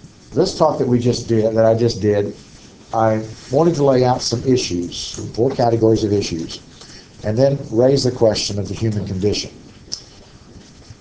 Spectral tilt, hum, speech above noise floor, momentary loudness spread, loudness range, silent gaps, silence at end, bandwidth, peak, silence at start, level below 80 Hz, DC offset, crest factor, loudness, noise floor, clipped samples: -6 dB/octave; none; 26 dB; 14 LU; 2 LU; none; 0.05 s; 8 kHz; 0 dBFS; 0.05 s; -42 dBFS; under 0.1%; 18 dB; -18 LUFS; -43 dBFS; under 0.1%